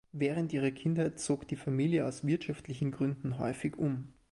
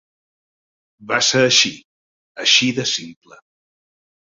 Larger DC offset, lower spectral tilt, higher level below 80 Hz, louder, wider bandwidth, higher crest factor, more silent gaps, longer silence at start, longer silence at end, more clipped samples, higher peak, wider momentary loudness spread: neither; first, -6.5 dB/octave vs -2 dB/octave; about the same, -64 dBFS vs -62 dBFS; second, -34 LUFS vs -15 LUFS; first, 11.5 kHz vs 7.8 kHz; second, 14 dB vs 22 dB; second, none vs 1.85-2.35 s; second, 0.15 s vs 1 s; second, 0.2 s vs 1.2 s; neither; second, -20 dBFS vs 0 dBFS; second, 5 LU vs 9 LU